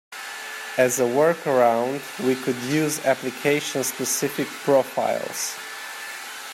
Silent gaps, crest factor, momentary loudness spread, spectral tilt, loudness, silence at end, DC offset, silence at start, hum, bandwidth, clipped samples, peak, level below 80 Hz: none; 18 dB; 13 LU; -3.5 dB/octave; -23 LUFS; 0 s; under 0.1%; 0.1 s; none; 16.5 kHz; under 0.1%; -6 dBFS; -72 dBFS